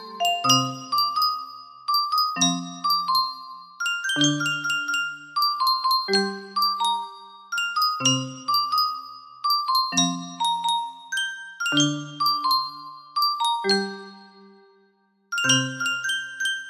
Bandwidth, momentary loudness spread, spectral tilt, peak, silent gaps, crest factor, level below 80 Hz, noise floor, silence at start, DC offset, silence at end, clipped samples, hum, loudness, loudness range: 15.5 kHz; 10 LU; -2 dB/octave; -6 dBFS; none; 20 dB; -74 dBFS; -64 dBFS; 0 s; under 0.1%; 0 s; under 0.1%; none; -23 LUFS; 2 LU